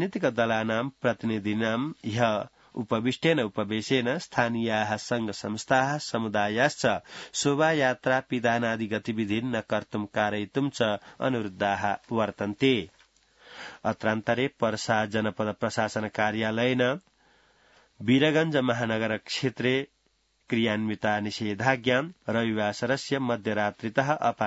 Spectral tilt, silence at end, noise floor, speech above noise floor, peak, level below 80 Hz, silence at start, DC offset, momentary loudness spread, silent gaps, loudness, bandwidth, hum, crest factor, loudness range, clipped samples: -5 dB/octave; 0 s; -70 dBFS; 43 dB; -6 dBFS; -66 dBFS; 0 s; under 0.1%; 6 LU; none; -27 LUFS; 8 kHz; none; 22 dB; 3 LU; under 0.1%